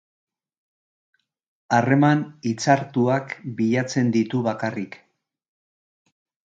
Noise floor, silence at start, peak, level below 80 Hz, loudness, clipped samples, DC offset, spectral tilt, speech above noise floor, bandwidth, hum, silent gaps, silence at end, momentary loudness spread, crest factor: under -90 dBFS; 1.7 s; -4 dBFS; -68 dBFS; -22 LUFS; under 0.1%; under 0.1%; -6.5 dB/octave; over 69 dB; 8.8 kHz; none; none; 1.5 s; 10 LU; 20 dB